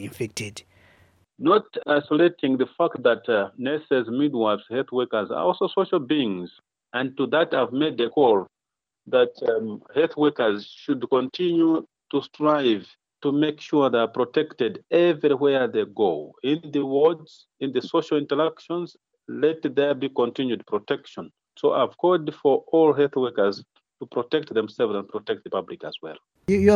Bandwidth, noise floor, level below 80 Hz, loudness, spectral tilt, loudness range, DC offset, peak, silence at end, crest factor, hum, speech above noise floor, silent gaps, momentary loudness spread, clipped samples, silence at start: 11.5 kHz; -87 dBFS; -64 dBFS; -23 LUFS; -6 dB/octave; 3 LU; under 0.1%; -4 dBFS; 0 s; 18 dB; none; 65 dB; none; 11 LU; under 0.1%; 0 s